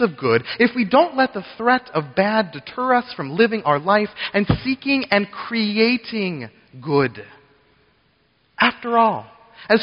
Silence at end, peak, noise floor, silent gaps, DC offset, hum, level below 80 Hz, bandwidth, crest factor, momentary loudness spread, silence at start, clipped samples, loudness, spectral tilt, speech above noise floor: 0 s; -2 dBFS; -62 dBFS; none; under 0.1%; none; -48 dBFS; 5.6 kHz; 18 dB; 9 LU; 0 s; under 0.1%; -19 LUFS; -3.5 dB/octave; 42 dB